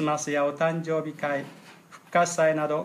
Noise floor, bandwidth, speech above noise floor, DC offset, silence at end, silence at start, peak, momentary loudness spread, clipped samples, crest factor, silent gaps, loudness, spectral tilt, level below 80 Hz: -50 dBFS; 14.5 kHz; 24 dB; under 0.1%; 0 s; 0 s; -10 dBFS; 7 LU; under 0.1%; 16 dB; none; -26 LUFS; -4.5 dB/octave; -78 dBFS